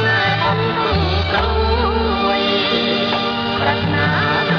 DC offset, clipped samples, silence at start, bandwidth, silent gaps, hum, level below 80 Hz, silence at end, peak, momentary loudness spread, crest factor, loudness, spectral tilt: under 0.1%; under 0.1%; 0 s; 6.8 kHz; none; none; -28 dBFS; 0 s; -4 dBFS; 2 LU; 12 dB; -17 LUFS; -6.5 dB/octave